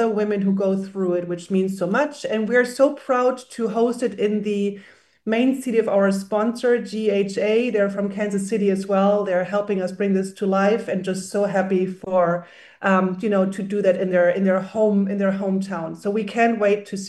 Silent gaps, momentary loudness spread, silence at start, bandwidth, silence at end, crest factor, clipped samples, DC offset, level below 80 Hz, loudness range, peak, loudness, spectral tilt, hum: none; 6 LU; 0 s; 12.5 kHz; 0 s; 16 dB; under 0.1%; under 0.1%; -70 dBFS; 1 LU; -4 dBFS; -21 LUFS; -6.5 dB/octave; none